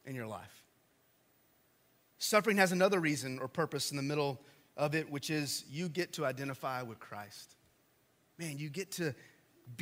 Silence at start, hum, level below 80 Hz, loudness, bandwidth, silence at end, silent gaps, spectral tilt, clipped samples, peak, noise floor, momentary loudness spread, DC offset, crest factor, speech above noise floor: 0.05 s; none; -80 dBFS; -35 LUFS; 16 kHz; 0 s; none; -4 dB/octave; under 0.1%; -12 dBFS; -72 dBFS; 19 LU; under 0.1%; 24 dB; 36 dB